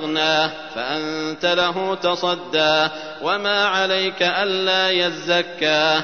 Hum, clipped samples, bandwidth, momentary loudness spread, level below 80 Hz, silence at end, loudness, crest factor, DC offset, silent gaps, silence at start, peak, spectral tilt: none; under 0.1%; 6.6 kHz; 7 LU; -64 dBFS; 0 s; -19 LUFS; 16 dB; 0.3%; none; 0 s; -4 dBFS; -3.5 dB/octave